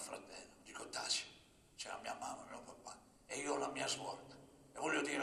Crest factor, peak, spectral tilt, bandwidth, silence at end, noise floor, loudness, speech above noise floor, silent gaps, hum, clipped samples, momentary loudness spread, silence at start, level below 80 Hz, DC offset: 20 dB; -24 dBFS; -1.5 dB/octave; 14 kHz; 0 s; -65 dBFS; -43 LUFS; 23 dB; none; none; under 0.1%; 19 LU; 0 s; -76 dBFS; under 0.1%